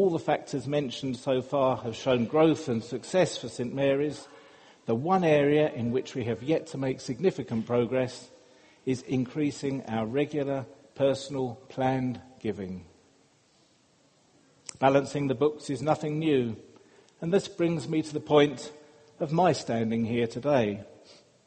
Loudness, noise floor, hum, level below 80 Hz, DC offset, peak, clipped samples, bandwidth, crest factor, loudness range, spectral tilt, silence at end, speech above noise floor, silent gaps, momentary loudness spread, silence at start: -28 LUFS; -64 dBFS; none; -64 dBFS; under 0.1%; -8 dBFS; under 0.1%; 8.8 kHz; 20 dB; 5 LU; -6.5 dB/octave; 0.35 s; 37 dB; none; 11 LU; 0 s